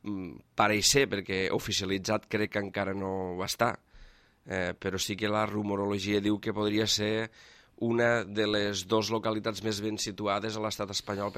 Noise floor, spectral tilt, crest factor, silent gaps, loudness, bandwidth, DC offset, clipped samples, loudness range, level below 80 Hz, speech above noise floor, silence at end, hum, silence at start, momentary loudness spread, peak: -55 dBFS; -3.5 dB/octave; 22 dB; none; -30 LUFS; 16 kHz; under 0.1%; under 0.1%; 4 LU; -58 dBFS; 25 dB; 0 s; none; 0.05 s; 7 LU; -10 dBFS